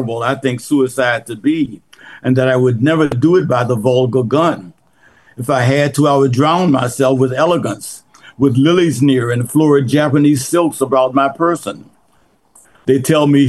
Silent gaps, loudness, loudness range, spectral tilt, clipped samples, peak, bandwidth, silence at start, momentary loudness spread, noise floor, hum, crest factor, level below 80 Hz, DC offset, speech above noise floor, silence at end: none; -14 LUFS; 2 LU; -6.5 dB/octave; under 0.1%; -2 dBFS; 12.5 kHz; 0 s; 9 LU; -56 dBFS; none; 12 dB; -54 dBFS; 0.2%; 43 dB; 0 s